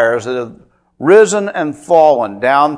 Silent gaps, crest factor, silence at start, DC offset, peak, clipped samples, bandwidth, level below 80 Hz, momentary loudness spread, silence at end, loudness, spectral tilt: none; 12 dB; 0 s; under 0.1%; 0 dBFS; 0.5%; 10.5 kHz; -56 dBFS; 13 LU; 0 s; -12 LUFS; -4.5 dB/octave